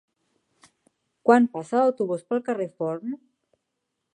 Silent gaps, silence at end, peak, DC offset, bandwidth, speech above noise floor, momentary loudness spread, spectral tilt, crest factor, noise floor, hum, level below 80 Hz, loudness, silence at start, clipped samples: none; 1 s; -4 dBFS; under 0.1%; 10 kHz; 57 dB; 13 LU; -7 dB/octave; 22 dB; -80 dBFS; none; -82 dBFS; -24 LUFS; 1.25 s; under 0.1%